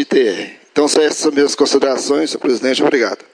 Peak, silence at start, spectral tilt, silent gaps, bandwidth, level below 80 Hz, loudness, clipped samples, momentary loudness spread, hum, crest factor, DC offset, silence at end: -2 dBFS; 0 s; -2.5 dB/octave; none; 10.5 kHz; -64 dBFS; -15 LUFS; under 0.1%; 4 LU; none; 14 dB; under 0.1%; 0.2 s